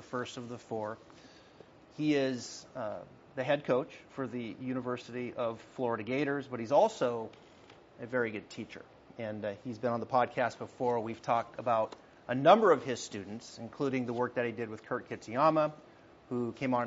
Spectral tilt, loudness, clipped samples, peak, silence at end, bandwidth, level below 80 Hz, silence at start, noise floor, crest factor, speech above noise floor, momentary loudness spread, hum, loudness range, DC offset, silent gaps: -4.5 dB/octave; -33 LUFS; under 0.1%; -8 dBFS; 0 s; 7.6 kHz; -74 dBFS; 0 s; -57 dBFS; 26 dB; 24 dB; 16 LU; none; 6 LU; under 0.1%; none